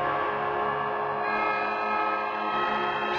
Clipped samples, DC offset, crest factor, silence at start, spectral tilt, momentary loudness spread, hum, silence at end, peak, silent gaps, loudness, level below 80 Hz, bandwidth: under 0.1%; under 0.1%; 12 dB; 0 s; -5.5 dB/octave; 2 LU; none; 0 s; -16 dBFS; none; -27 LUFS; -62 dBFS; 7.4 kHz